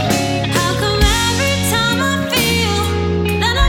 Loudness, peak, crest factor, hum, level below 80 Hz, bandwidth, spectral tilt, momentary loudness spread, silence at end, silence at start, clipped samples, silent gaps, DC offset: -15 LUFS; -2 dBFS; 14 dB; none; -24 dBFS; 19.5 kHz; -4 dB/octave; 3 LU; 0 s; 0 s; under 0.1%; none; under 0.1%